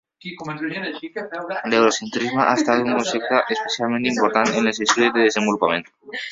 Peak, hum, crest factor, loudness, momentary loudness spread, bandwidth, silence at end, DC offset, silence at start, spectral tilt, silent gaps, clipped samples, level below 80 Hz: 0 dBFS; none; 20 dB; -20 LUFS; 13 LU; 8 kHz; 0 s; under 0.1%; 0.25 s; -3.5 dB/octave; none; under 0.1%; -64 dBFS